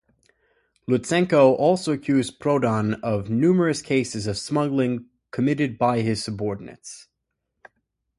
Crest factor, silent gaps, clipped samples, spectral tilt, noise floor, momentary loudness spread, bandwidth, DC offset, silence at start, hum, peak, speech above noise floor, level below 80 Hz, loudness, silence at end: 20 dB; none; under 0.1%; -6 dB/octave; -79 dBFS; 16 LU; 11.5 kHz; under 0.1%; 0.9 s; none; -4 dBFS; 57 dB; -56 dBFS; -22 LUFS; 1.2 s